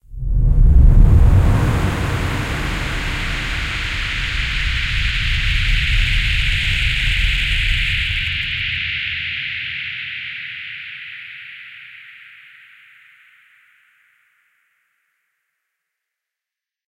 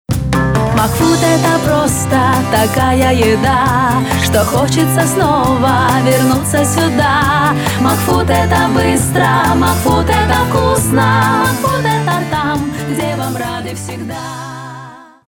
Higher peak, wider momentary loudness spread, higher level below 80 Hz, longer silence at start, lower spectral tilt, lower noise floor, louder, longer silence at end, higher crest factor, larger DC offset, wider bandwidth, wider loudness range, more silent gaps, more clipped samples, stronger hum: about the same, 0 dBFS vs 0 dBFS; first, 17 LU vs 8 LU; first, -20 dBFS vs -30 dBFS; about the same, 0.1 s vs 0.1 s; about the same, -4.5 dB/octave vs -5 dB/octave; first, -87 dBFS vs -33 dBFS; second, -18 LUFS vs -12 LUFS; first, 4.75 s vs 0.25 s; first, 18 dB vs 12 dB; neither; second, 12.5 kHz vs over 20 kHz; first, 16 LU vs 3 LU; neither; neither; neither